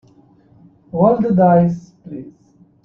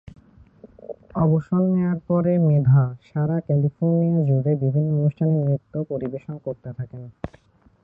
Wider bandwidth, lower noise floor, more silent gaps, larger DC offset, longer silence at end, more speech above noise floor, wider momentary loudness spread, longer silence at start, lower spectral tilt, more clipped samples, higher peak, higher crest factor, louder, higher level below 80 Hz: about the same, 2.8 kHz vs 2.8 kHz; about the same, -50 dBFS vs -49 dBFS; neither; neither; about the same, 0.55 s vs 0.55 s; first, 36 dB vs 28 dB; first, 21 LU vs 16 LU; first, 0.95 s vs 0.65 s; second, -11 dB/octave vs -13 dB/octave; neither; first, -2 dBFS vs -8 dBFS; about the same, 16 dB vs 14 dB; first, -15 LUFS vs -21 LUFS; about the same, -54 dBFS vs -54 dBFS